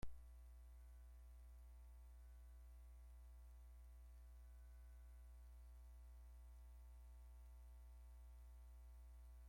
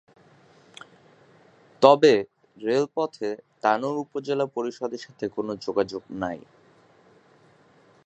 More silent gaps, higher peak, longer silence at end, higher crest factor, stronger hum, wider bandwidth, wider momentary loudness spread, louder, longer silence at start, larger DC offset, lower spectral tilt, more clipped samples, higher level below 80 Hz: neither; second, -36 dBFS vs 0 dBFS; second, 0 s vs 1.7 s; about the same, 22 dB vs 26 dB; first, 60 Hz at -60 dBFS vs none; first, 16 kHz vs 8.6 kHz; second, 1 LU vs 15 LU; second, -64 LUFS vs -25 LUFS; second, 0 s vs 1.8 s; neither; about the same, -6 dB/octave vs -5.5 dB/octave; neither; first, -60 dBFS vs -68 dBFS